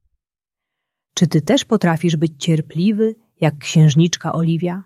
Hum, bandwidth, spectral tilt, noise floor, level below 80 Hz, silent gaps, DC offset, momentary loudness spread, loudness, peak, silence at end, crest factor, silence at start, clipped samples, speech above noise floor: none; 12.5 kHz; -6 dB/octave; -87 dBFS; -58 dBFS; none; under 0.1%; 7 LU; -17 LUFS; -2 dBFS; 0.05 s; 16 dB; 1.15 s; under 0.1%; 71 dB